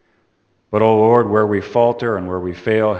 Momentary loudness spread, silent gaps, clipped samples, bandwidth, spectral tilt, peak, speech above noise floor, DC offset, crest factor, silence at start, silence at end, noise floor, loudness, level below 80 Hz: 10 LU; none; under 0.1%; 6.8 kHz; -8.5 dB/octave; 0 dBFS; 47 dB; under 0.1%; 16 dB; 0.75 s; 0 s; -63 dBFS; -16 LUFS; -54 dBFS